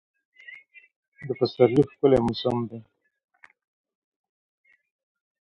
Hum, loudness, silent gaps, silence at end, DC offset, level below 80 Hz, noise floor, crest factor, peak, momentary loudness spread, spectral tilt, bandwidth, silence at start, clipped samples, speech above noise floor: none; -23 LUFS; 0.96-1.12 s; 2.6 s; under 0.1%; -56 dBFS; -48 dBFS; 24 dB; -4 dBFS; 24 LU; -8 dB/octave; 10.5 kHz; 0.5 s; under 0.1%; 26 dB